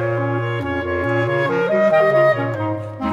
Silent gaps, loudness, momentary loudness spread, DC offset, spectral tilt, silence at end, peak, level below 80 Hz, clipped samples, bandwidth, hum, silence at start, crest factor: none; -18 LUFS; 9 LU; under 0.1%; -8 dB/octave; 0 s; -4 dBFS; -48 dBFS; under 0.1%; 11 kHz; none; 0 s; 14 dB